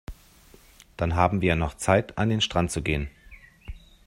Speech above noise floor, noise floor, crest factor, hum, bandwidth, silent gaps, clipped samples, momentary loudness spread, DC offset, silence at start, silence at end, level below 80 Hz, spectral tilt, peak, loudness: 30 dB; -54 dBFS; 24 dB; none; 16 kHz; none; under 0.1%; 23 LU; under 0.1%; 0.1 s; 0.35 s; -42 dBFS; -5 dB/octave; -4 dBFS; -25 LUFS